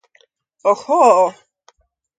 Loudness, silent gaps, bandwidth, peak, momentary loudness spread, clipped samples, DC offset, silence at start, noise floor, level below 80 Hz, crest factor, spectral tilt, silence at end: -15 LUFS; none; 9.4 kHz; 0 dBFS; 8 LU; under 0.1%; under 0.1%; 0.65 s; -58 dBFS; -72 dBFS; 18 dB; -4 dB/octave; 0.9 s